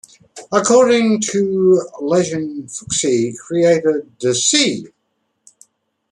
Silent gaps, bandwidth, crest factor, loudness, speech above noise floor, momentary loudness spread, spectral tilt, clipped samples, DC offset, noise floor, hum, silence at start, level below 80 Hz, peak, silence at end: none; 11.5 kHz; 16 dB; -16 LUFS; 54 dB; 9 LU; -3.5 dB/octave; under 0.1%; under 0.1%; -69 dBFS; none; 0.35 s; -60 dBFS; -2 dBFS; 1.25 s